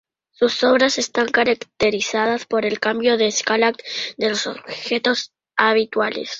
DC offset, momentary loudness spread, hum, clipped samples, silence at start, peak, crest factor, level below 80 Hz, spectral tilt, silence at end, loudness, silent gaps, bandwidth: under 0.1%; 8 LU; none; under 0.1%; 0.4 s; -2 dBFS; 18 dB; -58 dBFS; -2.5 dB/octave; 0 s; -19 LUFS; none; 7.8 kHz